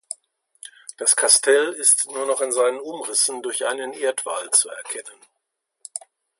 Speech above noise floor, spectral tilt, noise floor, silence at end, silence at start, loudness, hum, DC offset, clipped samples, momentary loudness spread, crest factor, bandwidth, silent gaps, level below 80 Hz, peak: 56 dB; 1.5 dB/octave; -78 dBFS; 0.4 s; 0.1 s; -19 LUFS; none; under 0.1%; under 0.1%; 20 LU; 24 dB; 12 kHz; none; -84 dBFS; 0 dBFS